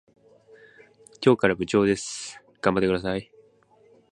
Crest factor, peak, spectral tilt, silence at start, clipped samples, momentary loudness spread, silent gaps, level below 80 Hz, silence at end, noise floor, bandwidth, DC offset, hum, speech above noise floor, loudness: 24 dB; -4 dBFS; -5 dB/octave; 1.2 s; under 0.1%; 13 LU; none; -54 dBFS; 0.9 s; -58 dBFS; 11 kHz; under 0.1%; none; 36 dB; -24 LUFS